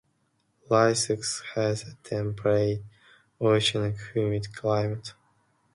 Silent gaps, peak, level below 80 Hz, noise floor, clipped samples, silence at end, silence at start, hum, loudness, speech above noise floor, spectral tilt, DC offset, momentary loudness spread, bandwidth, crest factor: none; -8 dBFS; -58 dBFS; -71 dBFS; under 0.1%; 0.65 s; 0.7 s; none; -27 LUFS; 45 dB; -4.5 dB/octave; under 0.1%; 11 LU; 11.5 kHz; 20 dB